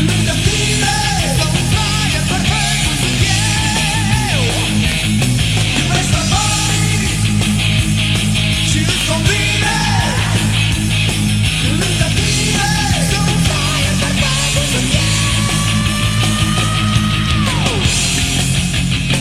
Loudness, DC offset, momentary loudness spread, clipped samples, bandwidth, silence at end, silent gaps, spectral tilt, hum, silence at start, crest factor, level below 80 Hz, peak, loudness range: -14 LUFS; under 0.1%; 1 LU; under 0.1%; 16 kHz; 0 s; none; -3.5 dB/octave; none; 0 s; 12 dB; -24 dBFS; -2 dBFS; 0 LU